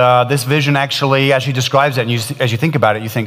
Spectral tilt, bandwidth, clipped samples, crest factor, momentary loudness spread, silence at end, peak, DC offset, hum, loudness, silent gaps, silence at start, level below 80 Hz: -5 dB/octave; 16 kHz; under 0.1%; 14 dB; 4 LU; 0 s; 0 dBFS; under 0.1%; none; -14 LUFS; none; 0 s; -58 dBFS